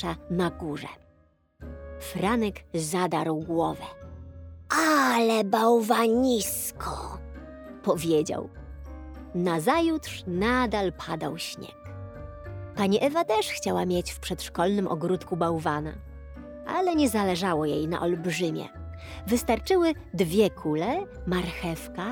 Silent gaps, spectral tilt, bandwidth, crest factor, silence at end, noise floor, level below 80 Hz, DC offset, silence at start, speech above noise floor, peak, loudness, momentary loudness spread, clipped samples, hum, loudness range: none; -5 dB/octave; over 20 kHz; 20 dB; 0 s; -63 dBFS; -48 dBFS; under 0.1%; 0 s; 37 dB; -8 dBFS; -26 LUFS; 19 LU; under 0.1%; none; 6 LU